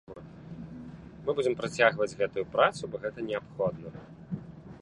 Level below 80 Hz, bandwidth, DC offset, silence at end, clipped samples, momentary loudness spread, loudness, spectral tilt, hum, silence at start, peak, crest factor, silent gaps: -60 dBFS; 11 kHz; under 0.1%; 0.05 s; under 0.1%; 21 LU; -30 LUFS; -5 dB/octave; none; 0.1 s; -8 dBFS; 24 dB; none